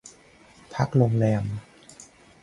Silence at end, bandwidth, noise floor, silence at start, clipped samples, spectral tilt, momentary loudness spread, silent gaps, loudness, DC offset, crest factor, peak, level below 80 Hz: 0.4 s; 11 kHz; -53 dBFS; 0.05 s; under 0.1%; -8 dB/octave; 22 LU; none; -24 LUFS; under 0.1%; 20 dB; -6 dBFS; -54 dBFS